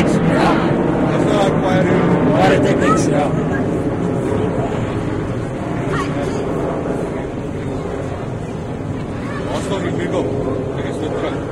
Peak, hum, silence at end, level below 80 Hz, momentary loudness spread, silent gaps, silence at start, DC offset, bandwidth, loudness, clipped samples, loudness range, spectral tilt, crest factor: -2 dBFS; none; 0 s; -36 dBFS; 10 LU; none; 0 s; under 0.1%; 12 kHz; -18 LUFS; under 0.1%; 8 LU; -7 dB/octave; 16 dB